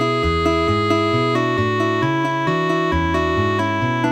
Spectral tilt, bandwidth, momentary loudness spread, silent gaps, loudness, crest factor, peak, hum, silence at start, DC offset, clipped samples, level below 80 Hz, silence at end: -6.5 dB/octave; 11.5 kHz; 2 LU; none; -18 LUFS; 12 dB; -6 dBFS; none; 0 s; under 0.1%; under 0.1%; -34 dBFS; 0 s